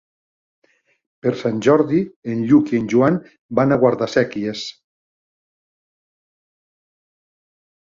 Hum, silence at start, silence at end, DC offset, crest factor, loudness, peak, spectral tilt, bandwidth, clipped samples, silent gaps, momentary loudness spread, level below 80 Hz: none; 1.25 s; 3.25 s; under 0.1%; 18 dB; -18 LUFS; -2 dBFS; -7 dB/octave; 7.6 kHz; under 0.1%; 2.16-2.22 s, 3.39-3.49 s; 10 LU; -58 dBFS